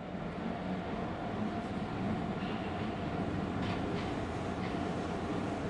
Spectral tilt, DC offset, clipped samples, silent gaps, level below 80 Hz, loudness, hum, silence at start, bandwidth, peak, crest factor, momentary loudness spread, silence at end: -7 dB/octave; under 0.1%; under 0.1%; none; -54 dBFS; -37 LUFS; none; 0 s; 11 kHz; -24 dBFS; 14 dB; 2 LU; 0 s